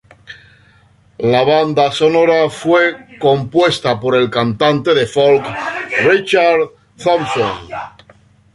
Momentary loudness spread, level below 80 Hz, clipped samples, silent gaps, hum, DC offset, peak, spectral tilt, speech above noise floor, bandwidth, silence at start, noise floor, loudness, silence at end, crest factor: 9 LU; -52 dBFS; under 0.1%; none; none; under 0.1%; 0 dBFS; -5.5 dB/octave; 36 dB; 11.5 kHz; 0.3 s; -50 dBFS; -14 LUFS; 0.65 s; 14 dB